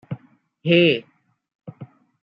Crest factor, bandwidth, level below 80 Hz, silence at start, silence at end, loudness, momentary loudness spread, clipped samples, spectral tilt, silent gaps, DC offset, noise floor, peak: 20 dB; 5.4 kHz; -68 dBFS; 0.1 s; 0.4 s; -19 LUFS; 25 LU; under 0.1%; -8.5 dB/octave; 1.55-1.59 s; under 0.1%; -49 dBFS; -4 dBFS